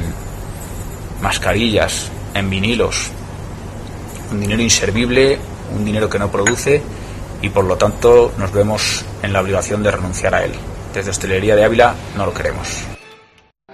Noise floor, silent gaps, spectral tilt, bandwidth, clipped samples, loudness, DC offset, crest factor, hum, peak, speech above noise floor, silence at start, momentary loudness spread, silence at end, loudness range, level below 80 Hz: -50 dBFS; none; -4 dB/octave; 13.5 kHz; under 0.1%; -16 LUFS; under 0.1%; 16 dB; none; 0 dBFS; 35 dB; 0 s; 17 LU; 0 s; 3 LU; -32 dBFS